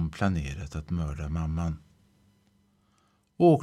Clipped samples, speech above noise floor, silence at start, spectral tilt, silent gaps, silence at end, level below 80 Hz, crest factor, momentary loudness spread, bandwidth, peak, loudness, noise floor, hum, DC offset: under 0.1%; 38 dB; 0 s; -8 dB/octave; none; 0 s; -42 dBFS; 20 dB; 12 LU; 11.5 kHz; -10 dBFS; -30 LUFS; -68 dBFS; none; under 0.1%